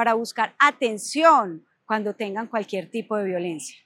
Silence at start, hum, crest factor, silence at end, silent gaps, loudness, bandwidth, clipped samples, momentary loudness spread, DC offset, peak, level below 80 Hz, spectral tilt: 0 s; none; 20 dB; 0.15 s; none; -23 LUFS; 16.5 kHz; under 0.1%; 13 LU; under 0.1%; -4 dBFS; under -90 dBFS; -3.5 dB/octave